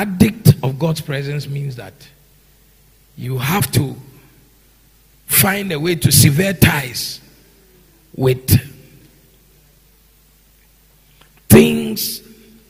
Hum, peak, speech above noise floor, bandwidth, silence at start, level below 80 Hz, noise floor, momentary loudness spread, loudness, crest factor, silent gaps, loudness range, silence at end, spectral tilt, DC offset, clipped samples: none; 0 dBFS; 35 dB; 16 kHz; 0 s; -42 dBFS; -51 dBFS; 20 LU; -15 LUFS; 18 dB; none; 8 LU; 0.5 s; -5 dB/octave; under 0.1%; 0.3%